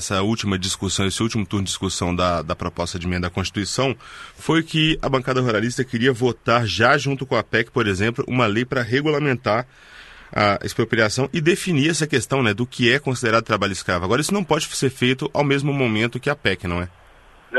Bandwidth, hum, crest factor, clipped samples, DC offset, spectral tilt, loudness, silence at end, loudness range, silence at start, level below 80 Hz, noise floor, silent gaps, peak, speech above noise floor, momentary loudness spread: 12.5 kHz; none; 18 dB; under 0.1%; under 0.1%; -4.5 dB/octave; -20 LUFS; 0 s; 3 LU; 0 s; -46 dBFS; -49 dBFS; none; -2 dBFS; 28 dB; 6 LU